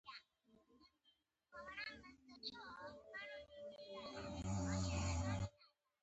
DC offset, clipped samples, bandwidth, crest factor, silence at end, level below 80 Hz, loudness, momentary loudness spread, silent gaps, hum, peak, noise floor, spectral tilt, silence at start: under 0.1%; under 0.1%; 8.2 kHz; 18 dB; 0.35 s; -56 dBFS; -47 LUFS; 16 LU; none; none; -30 dBFS; -80 dBFS; -5 dB/octave; 0.05 s